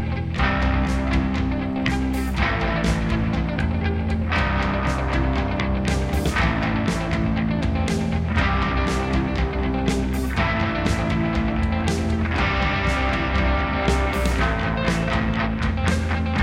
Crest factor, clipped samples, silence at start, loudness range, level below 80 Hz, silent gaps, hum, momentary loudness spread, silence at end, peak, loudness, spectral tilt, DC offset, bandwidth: 16 dB; under 0.1%; 0 s; 1 LU; -26 dBFS; none; none; 2 LU; 0 s; -6 dBFS; -22 LUFS; -6 dB/octave; under 0.1%; 15.5 kHz